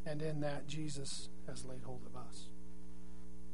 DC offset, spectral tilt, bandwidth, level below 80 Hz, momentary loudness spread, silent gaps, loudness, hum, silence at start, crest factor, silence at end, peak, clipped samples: 2%; -5 dB/octave; 11 kHz; -58 dBFS; 15 LU; none; -45 LUFS; none; 0 s; 18 dB; 0 s; -24 dBFS; under 0.1%